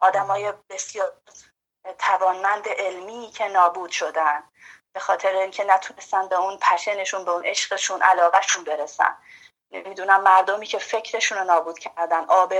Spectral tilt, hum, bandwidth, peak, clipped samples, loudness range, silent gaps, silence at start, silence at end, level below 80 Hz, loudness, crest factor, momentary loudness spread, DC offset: 0 dB/octave; none; 11 kHz; -2 dBFS; under 0.1%; 4 LU; none; 0 s; 0 s; -76 dBFS; -21 LUFS; 20 dB; 14 LU; under 0.1%